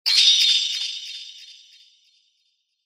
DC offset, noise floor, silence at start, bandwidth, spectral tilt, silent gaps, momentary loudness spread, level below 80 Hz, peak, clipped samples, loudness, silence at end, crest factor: under 0.1%; -70 dBFS; 0.05 s; 16 kHz; 9 dB/octave; none; 22 LU; under -90 dBFS; -2 dBFS; under 0.1%; -16 LUFS; 1.35 s; 22 dB